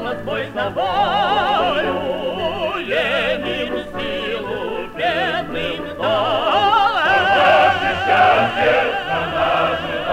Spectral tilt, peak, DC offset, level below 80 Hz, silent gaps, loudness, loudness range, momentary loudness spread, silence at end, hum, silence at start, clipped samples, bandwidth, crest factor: -5 dB/octave; -4 dBFS; under 0.1%; -46 dBFS; none; -18 LUFS; 6 LU; 10 LU; 0 s; none; 0 s; under 0.1%; 16 kHz; 14 dB